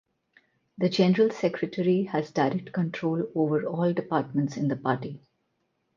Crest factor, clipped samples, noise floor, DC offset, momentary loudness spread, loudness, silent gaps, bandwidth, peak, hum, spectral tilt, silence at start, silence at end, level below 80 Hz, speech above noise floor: 18 dB; under 0.1%; -75 dBFS; under 0.1%; 7 LU; -27 LUFS; none; 7.4 kHz; -8 dBFS; none; -7.5 dB/octave; 0.8 s; 0.8 s; -70 dBFS; 49 dB